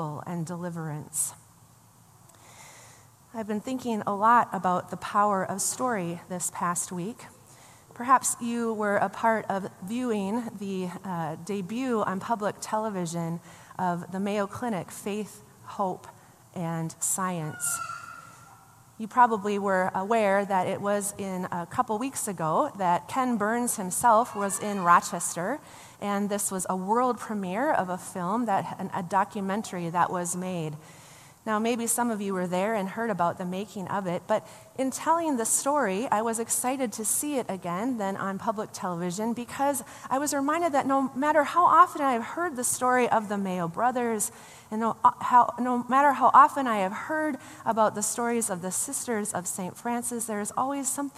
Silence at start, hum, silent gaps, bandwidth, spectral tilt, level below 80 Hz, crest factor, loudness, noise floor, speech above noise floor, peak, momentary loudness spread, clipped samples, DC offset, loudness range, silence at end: 0 s; none; none; 15 kHz; -4 dB/octave; -70 dBFS; 22 dB; -27 LUFS; -56 dBFS; 29 dB; -4 dBFS; 12 LU; under 0.1%; under 0.1%; 8 LU; 0.1 s